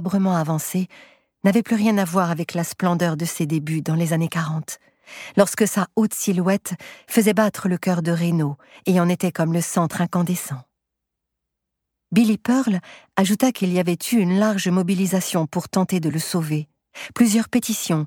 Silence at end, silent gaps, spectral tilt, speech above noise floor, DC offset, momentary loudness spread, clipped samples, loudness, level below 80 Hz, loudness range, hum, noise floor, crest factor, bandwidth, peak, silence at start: 0 s; none; -5.5 dB/octave; 61 dB; under 0.1%; 9 LU; under 0.1%; -21 LUFS; -64 dBFS; 3 LU; none; -81 dBFS; 18 dB; 18.5 kHz; -2 dBFS; 0 s